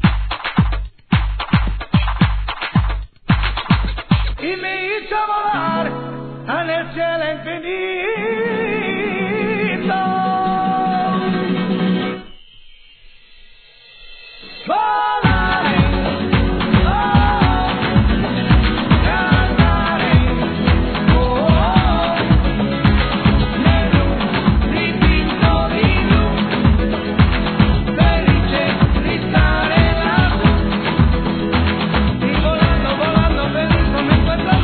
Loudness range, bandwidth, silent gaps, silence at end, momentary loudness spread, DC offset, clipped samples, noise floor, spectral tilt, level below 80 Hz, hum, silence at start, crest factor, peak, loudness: 6 LU; 4.5 kHz; none; 0 s; 6 LU; 0.2%; under 0.1%; -44 dBFS; -10 dB/octave; -22 dBFS; none; 0 s; 16 dB; 0 dBFS; -16 LUFS